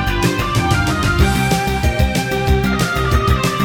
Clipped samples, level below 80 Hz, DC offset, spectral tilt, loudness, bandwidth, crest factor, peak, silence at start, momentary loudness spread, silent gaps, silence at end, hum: under 0.1%; -22 dBFS; under 0.1%; -5 dB/octave; -16 LUFS; over 20 kHz; 14 dB; -2 dBFS; 0 s; 2 LU; none; 0 s; none